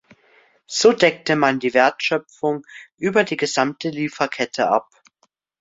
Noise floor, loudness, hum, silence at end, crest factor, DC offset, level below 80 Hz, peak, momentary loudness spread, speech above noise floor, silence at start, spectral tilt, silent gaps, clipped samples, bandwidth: -66 dBFS; -20 LUFS; none; 0.8 s; 20 dB; under 0.1%; -64 dBFS; 0 dBFS; 8 LU; 47 dB; 0.7 s; -4 dB/octave; none; under 0.1%; 8 kHz